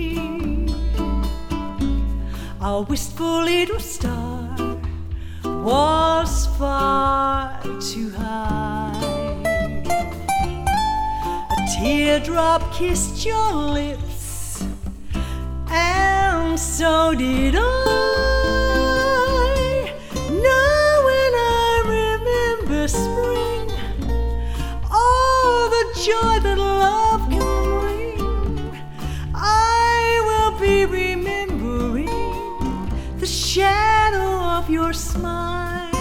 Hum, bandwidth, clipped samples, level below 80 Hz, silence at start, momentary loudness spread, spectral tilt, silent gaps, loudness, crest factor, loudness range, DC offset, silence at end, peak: none; 17 kHz; under 0.1%; -28 dBFS; 0 s; 11 LU; -4.5 dB/octave; none; -20 LUFS; 16 dB; 6 LU; under 0.1%; 0 s; -4 dBFS